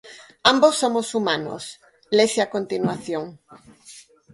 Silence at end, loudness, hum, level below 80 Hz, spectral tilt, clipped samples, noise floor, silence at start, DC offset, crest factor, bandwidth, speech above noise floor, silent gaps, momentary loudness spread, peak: 0.35 s; -21 LUFS; none; -64 dBFS; -3.5 dB/octave; under 0.1%; -48 dBFS; 0.05 s; under 0.1%; 22 dB; 11.5 kHz; 26 dB; none; 16 LU; 0 dBFS